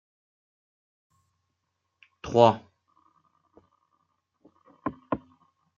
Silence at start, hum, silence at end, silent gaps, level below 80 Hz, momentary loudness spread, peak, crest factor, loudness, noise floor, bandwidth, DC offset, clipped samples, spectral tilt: 2.25 s; none; 0.6 s; none; -64 dBFS; 17 LU; -2 dBFS; 30 dB; -26 LUFS; -80 dBFS; 7.4 kHz; under 0.1%; under 0.1%; -7 dB/octave